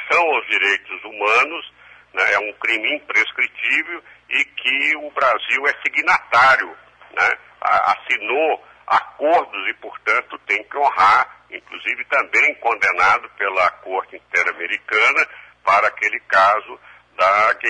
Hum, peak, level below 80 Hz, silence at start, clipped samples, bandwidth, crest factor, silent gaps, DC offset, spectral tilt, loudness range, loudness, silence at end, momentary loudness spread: none; -4 dBFS; -62 dBFS; 0 s; under 0.1%; 10.5 kHz; 16 dB; none; under 0.1%; -2 dB/octave; 2 LU; -17 LUFS; 0 s; 11 LU